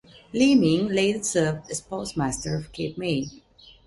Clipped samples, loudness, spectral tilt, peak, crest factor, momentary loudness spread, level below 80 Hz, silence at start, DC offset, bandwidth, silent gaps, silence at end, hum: under 0.1%; -24 LUFS; -5 dB/octave; -8 dBFS; 16 dB; 13 LU; -52 dBFS; 0.35 s; under 0.1%; 11.5 kHz; none; 0.5 s; none